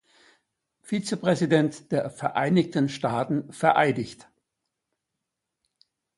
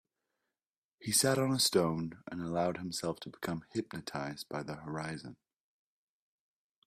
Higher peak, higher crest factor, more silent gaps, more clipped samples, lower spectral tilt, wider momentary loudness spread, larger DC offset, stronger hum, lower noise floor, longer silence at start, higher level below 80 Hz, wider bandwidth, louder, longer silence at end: first, -4 dBFS vs -14 dBFS; about the same, 24 dB vs 22 dB; neither; neither; first, -6 dB/octave vs -3.5 dB/octave; second, 8 LU vs 14 LU; neither; neither; second, -84 dBFS vs under -90 dBFS; about the same, 0.9 s vs 1 s; about the same, -66 dBFS vs -70 dBFS; second, 11.5 kHz vs 15.5 kHz; first, -25 LUFS vs -34 LUFS; first, 2.05 s vs 1.55 s